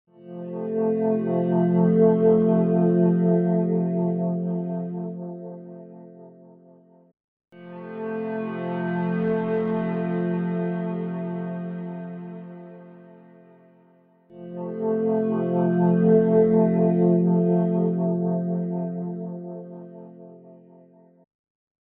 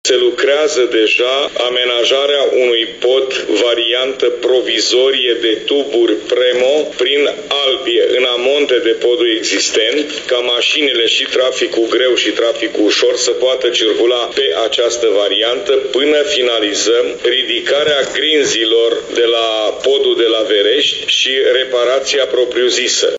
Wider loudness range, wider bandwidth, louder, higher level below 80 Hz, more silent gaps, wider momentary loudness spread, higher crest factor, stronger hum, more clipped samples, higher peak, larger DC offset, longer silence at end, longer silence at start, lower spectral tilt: first, 16 LU vs 1 LU; second, 3.3 kHz vs 8 kHz; second, -23 LUFS vs -12 LUFS; second, -66 dBFS vs -56 dBFS; first, 7.24-7.40 s vs none; first, 21 LU vs 3 LU; first, 18 dB vs 10 dB; neither; neither; second, -6 dBFS vs -2 dBFS; neither; first, 1.3 s vs 0 s; first, 0.2 s vs 0.05 s; first, -10.5 dB/octave vs -1 dB/octave